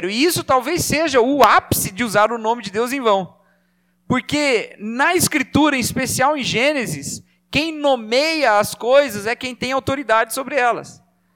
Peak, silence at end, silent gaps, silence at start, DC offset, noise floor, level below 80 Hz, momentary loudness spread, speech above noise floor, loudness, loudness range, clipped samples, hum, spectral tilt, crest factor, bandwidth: 0 dBFS; 0.4 s; none; 0 s; under 0.1%; -63 dBFS; -48 dBFS; 7 LU; 45 dB; -18 LUFS; 3 LU; under 0.1%; 60 Hz at -50 dBFS; -3.5 dB/octave; 18 dB; 18 kHz